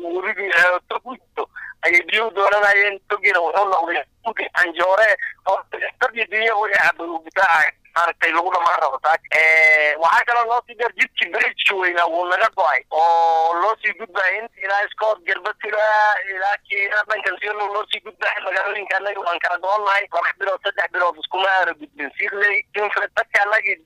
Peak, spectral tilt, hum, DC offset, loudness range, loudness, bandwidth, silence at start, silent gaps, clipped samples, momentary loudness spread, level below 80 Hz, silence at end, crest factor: -6 dBFS; -1.5 dB/octave; none; under 0.1%; 5 LU; -18 LUFS; 15.5 kHz; 0 s; none; under 0.1%; 9 LU; -64 dBFS; 0.1 s; 14 dB